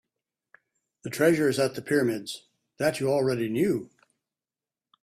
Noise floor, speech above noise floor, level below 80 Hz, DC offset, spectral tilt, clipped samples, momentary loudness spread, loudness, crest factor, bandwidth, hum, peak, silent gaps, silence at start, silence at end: under -90 dBFS; over 65 dB; -66 dBFS; under 0.1%; -5.5 dB/octave; under 0.1%; 14 LU; -26 LUFS; 20 dB; 15.5 kHz; none; -8 dBFS; none; 1.05 s; 1.15 s